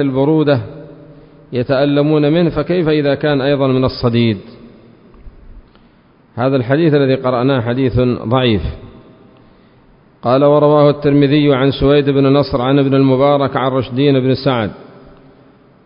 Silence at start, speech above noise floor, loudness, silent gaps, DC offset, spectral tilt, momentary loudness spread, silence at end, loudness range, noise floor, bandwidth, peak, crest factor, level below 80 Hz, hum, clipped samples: 0 s; 36 dB; -13 LUFS; none; under 0.1%; -12.5 dB/octave; 8 LU; 1 s; 6 LU; -48 dBFS; 5.4 kHz; 0 dBFS; 14 dB; -38 dBFS; none; under 0.1%